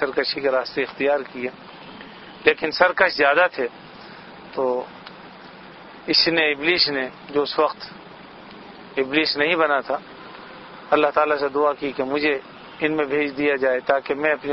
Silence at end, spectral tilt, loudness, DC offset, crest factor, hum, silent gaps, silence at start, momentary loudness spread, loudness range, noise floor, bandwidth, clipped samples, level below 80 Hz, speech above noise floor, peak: 0 s; -6 dB/octave; -21 LUFS; under 0.1%; 22 dB; none; none; 0 s; 23 LU; 2 LU; -42 dBFS; 6 kHz; under 0.1%; -60 dBFS; 21 dB; 0 dBFS